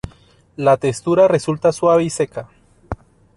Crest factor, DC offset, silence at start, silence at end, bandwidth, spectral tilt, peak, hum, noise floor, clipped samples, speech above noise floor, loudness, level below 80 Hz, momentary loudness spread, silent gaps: 16 dB; under 0.1%; 0.05 s; 0.4 s; 11.5 kHz; -6 dB/octave; -2 dBFS; none; -49 dBFS; under 0.1%; 33 dB; -17 LUFS; -46 dBFS; 19 LU; none